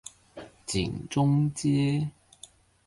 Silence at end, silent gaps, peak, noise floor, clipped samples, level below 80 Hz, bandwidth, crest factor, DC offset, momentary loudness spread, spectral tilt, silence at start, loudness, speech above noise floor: 0.75 s; none; -14 dBFS; -54 dBFS; under 0.1%; -52 dBFS; 11.5 kHz; 14 dB; under 0.1%; 20 LU; -6 dB/octave; 0.35 s; -27 LUFS; 28 dB